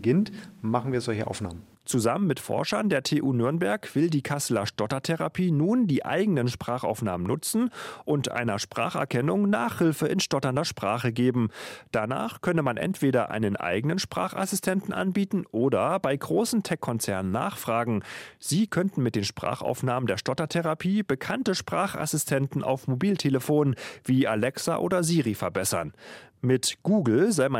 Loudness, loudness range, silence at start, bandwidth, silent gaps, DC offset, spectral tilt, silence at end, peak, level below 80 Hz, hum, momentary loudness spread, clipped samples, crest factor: -27 LUFS; 2 LU; 0 s; 16 kHz; none; under 0.1%; -5.5 dB/octave; 0 s; -8 dBFS; -64 dBFS; none; 6 LU; under 0.1%; 18 dB